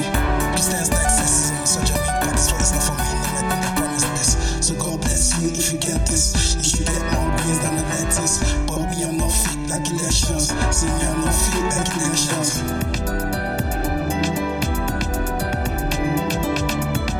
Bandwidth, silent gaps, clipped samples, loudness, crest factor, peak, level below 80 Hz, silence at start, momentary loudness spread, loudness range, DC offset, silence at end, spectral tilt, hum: 17.5 kHz; none; under 0.1%; -20 LUFS; 18 dB; -2 dBFS; -26 dBFS; 0 s; 6 LU; 4 LU; under 0.1%; 0 s; -3.5 dB/octave; none